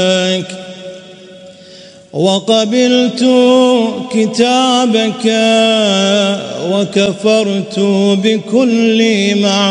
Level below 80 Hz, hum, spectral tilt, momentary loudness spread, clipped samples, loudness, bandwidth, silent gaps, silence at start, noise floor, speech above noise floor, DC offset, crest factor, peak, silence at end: -60 dBFS; none; -4.5 dB/octave; 7 LU; under 0.1%; -11 LUFS; 10.5 kHz; none; 0 s; -37 dBFS; 26 dB; under 0.1%; 12 dB; 0 dBFS; 0 s